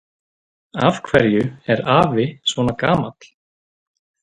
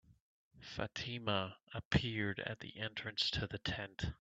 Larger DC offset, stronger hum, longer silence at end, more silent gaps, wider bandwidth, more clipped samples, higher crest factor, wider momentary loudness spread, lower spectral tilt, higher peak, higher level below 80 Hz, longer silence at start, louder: neither; neither; first, 1.1 s vs 0.05 s; second, none vs 0.20-0.51 s, 1.63-1.67 s, 1.85-1.91 s; first, 11 kHz vs 8.2 kHz; neither; about the same, 20 dB vs 24 dB; second, 5 LU vs 9 LU; about the same, -6 dB/octave vs -5 dB/octave; first, 0 dBFS vs -18 dBFS; first, -48 dBFS vs -56 dBFS; first, 0.75 s vs 0.1 s; first, -18 LUFS vs -40 LUFS